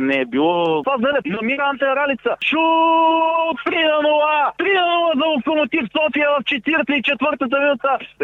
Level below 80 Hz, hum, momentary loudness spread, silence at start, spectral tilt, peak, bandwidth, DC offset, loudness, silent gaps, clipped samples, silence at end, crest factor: -60 dBFS; none; 4 LU; 0 s; -6 dB/octave; -6 dBFS; 6.8 kHz; under 0.1%; -17 LUFS; none; under 0.1%; 0 s; 12 dB